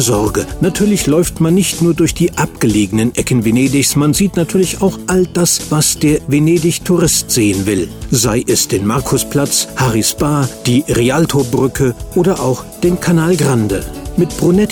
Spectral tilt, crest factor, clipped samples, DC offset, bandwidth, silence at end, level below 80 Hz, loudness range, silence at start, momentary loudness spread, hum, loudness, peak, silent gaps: -5 dB/octave; 10 dB; under 0.1%; under 0.1%; over 20 kHz; 0 s; -32 dBFS; 1 LU; 0 s; 5 LU; none; -13 LUFS; -2 dBFS; none